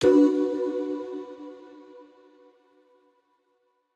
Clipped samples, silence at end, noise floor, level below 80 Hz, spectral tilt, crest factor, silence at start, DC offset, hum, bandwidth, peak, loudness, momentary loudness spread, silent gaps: under 0.1%; 1.95 s; -71 dBFS; -66 dBFS; -6 dB/octave; 18 dB; 0 s; under 0.1%; none; 8.8 kHz; -8 dBFS; -25 LUFS; 28 LU; none